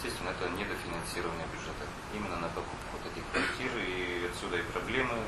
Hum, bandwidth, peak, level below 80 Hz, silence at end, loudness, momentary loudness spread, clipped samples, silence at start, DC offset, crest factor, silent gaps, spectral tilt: none; 13.5 kHz; -16 dBFS; -50 dBFS; 0 s; -35 LUFS; 8 LU; under 0.1%; 0 s; under 0.1%; 18 dB; none; -4 dB/octave